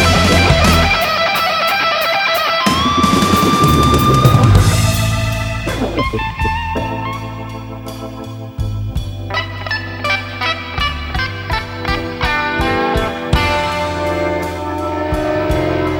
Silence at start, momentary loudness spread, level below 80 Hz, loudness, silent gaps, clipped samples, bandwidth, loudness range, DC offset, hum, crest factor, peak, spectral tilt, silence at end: 0 s; 12 LU; -26 dBFS; -15 LUFS; none; under 0.1%; 18 kHz; 10 LU; under 0.1%; none; 14 dB; 0 dBFS; -5 dB/octave; 0 s